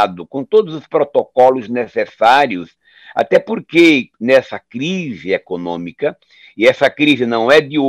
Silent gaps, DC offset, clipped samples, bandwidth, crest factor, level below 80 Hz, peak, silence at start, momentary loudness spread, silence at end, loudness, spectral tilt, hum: none; under 0.1%; under 0.1%; 12.5 kHz; 14 dB; -58 dBFS; -2 dBFS; 0 s; 12 LU; 0 s; -14 LUFS; -5.5 dB/octave; none